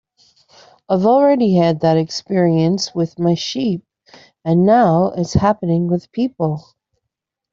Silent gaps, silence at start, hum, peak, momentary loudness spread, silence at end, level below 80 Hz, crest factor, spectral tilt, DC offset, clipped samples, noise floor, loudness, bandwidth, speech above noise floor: none; 0.9 s; none; -2 dBFS; 9 LU; 0.95 s; -46 dBFS; 14 dB; -7 dB/octave; under 0.1%; under 0.1%; -80 dBFS; -16 LUFS; 7.6 kHz; 64 dB